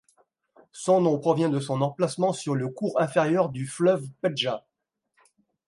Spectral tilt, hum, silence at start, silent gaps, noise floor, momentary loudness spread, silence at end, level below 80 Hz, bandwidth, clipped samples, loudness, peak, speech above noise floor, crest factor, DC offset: -6 dB/octave; none; 0.75 s; none; -78 dBFS; 7 LU; 1.1 s; -72 dBFS; 11.5 kHz; under 0.1%; -25 LUFS; -8 dBFS; 54 dB; 18 dB; under 0.1%